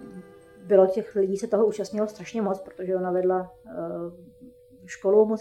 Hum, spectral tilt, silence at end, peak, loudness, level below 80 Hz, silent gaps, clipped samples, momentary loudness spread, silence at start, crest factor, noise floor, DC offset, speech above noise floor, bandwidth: none; -7 dB/octave; 0 s; -6 dBFS; -25 LUFS; -66 dBFS; none; under 0.1%; 17 LU; 0 s; 20 dB; -50 dBFS; under 0.1%; 25 dB; 12 kHz